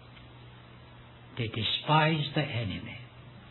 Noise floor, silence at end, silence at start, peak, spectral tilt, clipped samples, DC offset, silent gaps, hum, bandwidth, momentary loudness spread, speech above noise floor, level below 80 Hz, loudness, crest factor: -51 dBFS; 0 s; 0 s; -10 dBFS; -8.5 dB/octave; under 0.1%; under 0.1%; none; none; 4.3 kHz; 27 LU; 22 dB; -60 dBFS; -29 LUFS; 22 dB